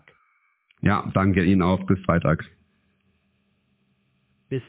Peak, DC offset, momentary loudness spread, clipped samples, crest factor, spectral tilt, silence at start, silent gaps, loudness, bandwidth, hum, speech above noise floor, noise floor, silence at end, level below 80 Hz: -6 dBFS; under 0.1%; 8 LU; under 0.1%; 18 dB; -11.5 dB/octave; 0.85 s; none; -22 LUFS; 4 kHz; none; 48 dB; -68 dBFS; 0.05 s; -42 dBFS